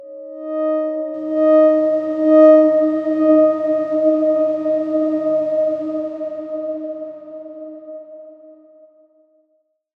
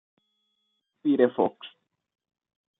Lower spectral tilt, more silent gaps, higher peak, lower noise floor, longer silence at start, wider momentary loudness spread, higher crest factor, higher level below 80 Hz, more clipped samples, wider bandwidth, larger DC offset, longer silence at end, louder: second, -8 dB/octave vs -9.5 dB/octave; neither; first, -2 dBFS vs -8 dBFS; second, -66 dBFS vs -77 dBFS; second, 0 s vs 1.05 s; about the same, 22 LU vs 23 LU; second, 16 dB vs 22 dB; first, -70 dBFS vs -78 dBFS; neither; first, 4.6 kHz vs 3.9 kHz; neither; first, 1.5 s vs 1.1 s; first, -16 LUFS vs -25 LUFS